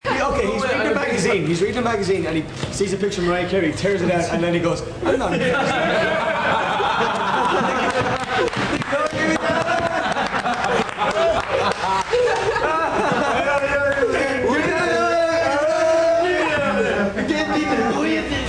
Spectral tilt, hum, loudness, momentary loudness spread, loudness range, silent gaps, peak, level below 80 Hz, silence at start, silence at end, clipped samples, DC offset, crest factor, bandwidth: -4.5 dB/octave; none; -20 LUFS; 3 LU; 2 LU; none; -6 dBFS; -42 dBFS; 0.05 s; 0 s; under 0.1%; under 0.1%; 14 dB; 10.5 kHz